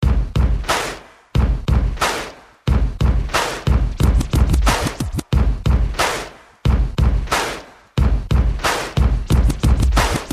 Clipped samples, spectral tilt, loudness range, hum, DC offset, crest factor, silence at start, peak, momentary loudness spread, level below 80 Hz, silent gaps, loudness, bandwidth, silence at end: under 0.1%; -5 dB/octave; 2 LU; none; under 0.1%; 14 dB; 0 s; -2 dBFS; 8 LU; -20 dBFS; none; -19 LUFS; 15 kHz; 0 s